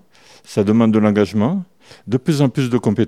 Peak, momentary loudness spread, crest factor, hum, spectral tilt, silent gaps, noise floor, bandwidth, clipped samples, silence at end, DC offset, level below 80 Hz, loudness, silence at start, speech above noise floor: 0 dBFS; 9 LU; 16 dB; none; -7.5 dB/octave; none; -47 dBFS; 13.5 kHz; under 0.1%; 0 s; 0.2%; -58 dBFS; -17 LUFS; 0.5 s; 31 dB